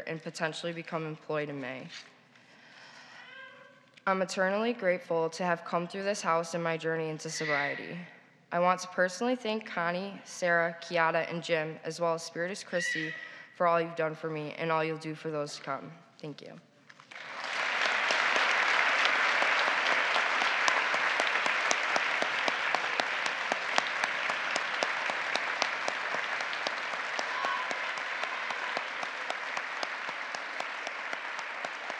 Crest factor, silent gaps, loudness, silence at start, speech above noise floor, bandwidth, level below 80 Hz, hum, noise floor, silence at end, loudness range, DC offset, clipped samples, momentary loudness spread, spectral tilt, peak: 28 dB; none; -30 LUFS; 0 s; 26 dB; 12.5 kHz; under -90 dBFS; none; -58 dBFS; 0 s; 9 LU; under 0.1%; under 0.1%; 13 LU; -3 dB/octave; -4 dBFS